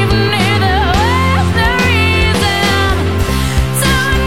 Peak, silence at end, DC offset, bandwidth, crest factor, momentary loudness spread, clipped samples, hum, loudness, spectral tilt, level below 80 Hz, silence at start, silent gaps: -2 dBFS; 0 s; 3%; 16.5 kHz; 10 dB; 4 LU; under 0.1%; none; -12 LUFS; -4.5 dB/octave; -20 dBFS; 0 s; none